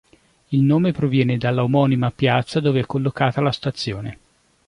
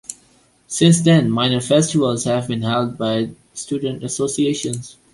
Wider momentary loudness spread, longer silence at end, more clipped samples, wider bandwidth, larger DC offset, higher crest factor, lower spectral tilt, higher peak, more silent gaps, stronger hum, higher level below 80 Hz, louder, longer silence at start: second, 8 LU vs 13 LU; first, 0.55 s vs 0.2 s; neither; about the same, 10.5 kHz vs 11.5 kHz; neither; about the same, 18 dB vs 16 dB; first, -7.5 dB/octave vs -5 dB/octave; about the same, -2 dBFS vs -2 dBFS; neither; neither; about the same, -52 dBFS vs -54 dBFS; about the same, -20 LUFS vs -18 LUFS; first, 0.5 s vs 0.1 s